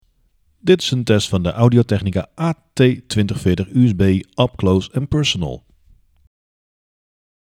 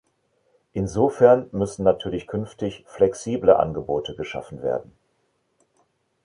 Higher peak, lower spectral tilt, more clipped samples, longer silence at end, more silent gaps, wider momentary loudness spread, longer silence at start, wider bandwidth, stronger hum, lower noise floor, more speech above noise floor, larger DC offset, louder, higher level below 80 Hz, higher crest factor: about the same, 0 dBFS vs -2 dBFS; about the same, -6.5 dB/octave vs -6.5 dB/octave; neither; first, 1.9 s vs 1.4 s; neither; second, 8 LU vs 14 LU; about the same, 0.65 s vs 0.75 s; first, 13 kHz vs 11 kHz; neither; second, -60 dBFS vs -70 dBFS; second, 43 dB vs 48 dB; neither; first, -17 LUFS vs -22 LUFS; first, -42 dBFS vs -50 dBFS; about the same, 18 dB vs 22 dB